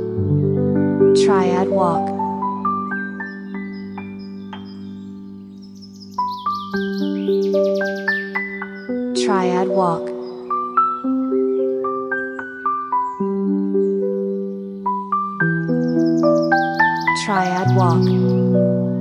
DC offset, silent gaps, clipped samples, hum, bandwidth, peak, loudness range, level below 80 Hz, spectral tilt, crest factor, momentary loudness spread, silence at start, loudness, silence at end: under 0.1%; none; under 0.1%; none; 10.5 kHz; -2 dBFS; 10 LU; -60 dBFS; -7 dB/octave; 16 dB; 16 LU; 0 s; -19 LUFS; 0 s